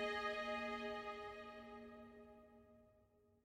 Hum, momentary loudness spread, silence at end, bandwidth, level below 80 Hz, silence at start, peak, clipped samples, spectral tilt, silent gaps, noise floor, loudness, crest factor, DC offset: none; 21 LU; 0.4 s; 16 kHz; -74 dBFS; 0 s; -32 dBFS; under 0.1%; -4 dB/octave; none; -74 dBFS; -47 LUFS; 16 dB; under 0.1%